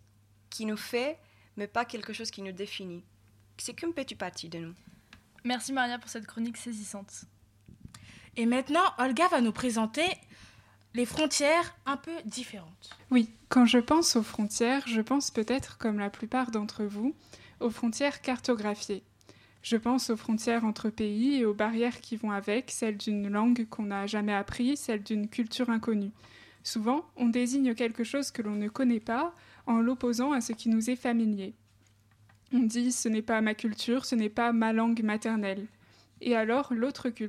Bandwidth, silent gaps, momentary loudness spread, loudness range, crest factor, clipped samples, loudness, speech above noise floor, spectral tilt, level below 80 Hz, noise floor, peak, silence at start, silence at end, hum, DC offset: 15 kHz; none; 13 LU; 9 LU; 18 dB; under 0.1%; -30 LUFS; 34 dB; -4 dB/octave; -64 dBFS; -63 dBFS; -12 dBFS; 0.5 s; 0 s; none; under 0.1%